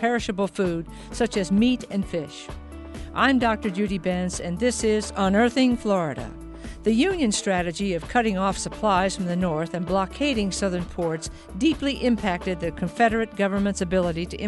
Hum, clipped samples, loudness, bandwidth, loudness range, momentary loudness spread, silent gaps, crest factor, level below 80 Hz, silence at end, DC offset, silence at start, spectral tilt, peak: none; under 0.1%; -24 LUFS; 11.5 kHz; 2 LU; 11 LU; none; 18 dB; -42 dBFS; 0 s; under 0.1%; 0 s; -5 dB/octave; -6 dBFS